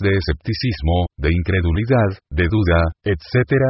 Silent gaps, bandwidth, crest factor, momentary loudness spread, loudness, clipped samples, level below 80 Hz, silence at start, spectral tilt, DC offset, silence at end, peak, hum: none; 5.8 kHz; 14 dB; 5 LU; -19 LUFS; under 0.1%; -26 dBFS; 0 s; -11 dB/octave; under 0.1%; 0 s; -2 dBFS; none